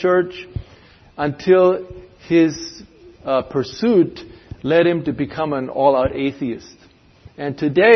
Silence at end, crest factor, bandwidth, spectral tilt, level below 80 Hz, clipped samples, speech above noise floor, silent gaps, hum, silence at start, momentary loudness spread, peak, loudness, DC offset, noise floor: 0 s; 18 dB; 6.4 kHz; -6.5 dB/octave; -46 dBFS; under 0.1%; 30 dB; none; none; 0 s; 18 LU; 0 dBFS; -19 LUFS; under 0.1%; -47 dBFS